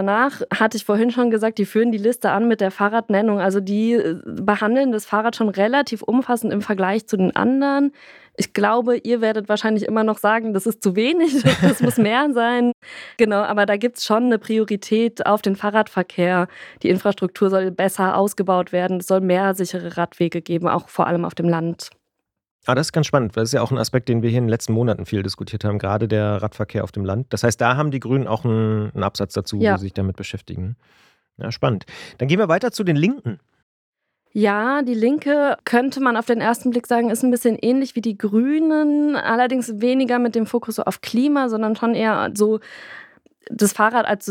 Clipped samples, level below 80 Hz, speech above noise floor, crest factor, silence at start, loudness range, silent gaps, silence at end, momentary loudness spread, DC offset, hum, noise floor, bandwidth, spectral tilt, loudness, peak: under 0.1%; -60 dBFS; 59 dB; 18 dB; 0 s; 4 LU; 12.74-12.82 s, 22.51-22.59 s, 33.63-33.93 s; 0 s; 7 LU; under 0.1%; none; -78 dBFS; 16.5 kHz; -6 dB/octave; -19 LUFS; -2 dBFS